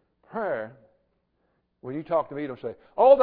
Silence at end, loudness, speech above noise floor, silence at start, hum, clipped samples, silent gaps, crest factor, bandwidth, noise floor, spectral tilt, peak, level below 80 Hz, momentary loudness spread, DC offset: 0 s; -28 LUFS; 49 dB; 0.35 s; none; under 0.1%; none; 20 dB; 4.5 kHz; -72 dBFS; -10 dB/octave; -6 dBFS; -64 dBFS; 16 LU; under 0.1%